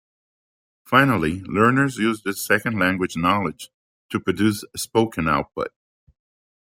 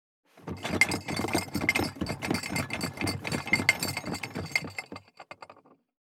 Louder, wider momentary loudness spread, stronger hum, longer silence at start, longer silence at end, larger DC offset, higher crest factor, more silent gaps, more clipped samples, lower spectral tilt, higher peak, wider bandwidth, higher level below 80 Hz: first, -21 LUFS vs -29 LUFS; second, 12 LU vs 21 LU; neither; first, 0.9 s vs 0.35 s; first, 1.1 s vs 0.65 s; neither; second, 20 dB vs 28 dB; first, 3.74-4.09 s vs none; neither; first, -5 dB/octave vs -3.5 dB/octave; about the same, -2 dBFS vs -4 dBFS; second, 16.5 kHz vs 19.5 kHz; first, -52 dBFS vs -58 dBFS